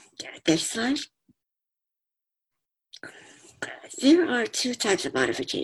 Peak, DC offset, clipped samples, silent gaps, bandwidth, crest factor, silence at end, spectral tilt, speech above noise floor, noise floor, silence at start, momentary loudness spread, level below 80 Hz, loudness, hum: -8 dBFS; under 0.1%; under 0.1%; none; 13 kHz; 20 dB; 0 s; -3 dB/octave; 63 dB; -87 dBFS; 0.2 s; 22 LU; -66 dBFS; -25 LUFS; none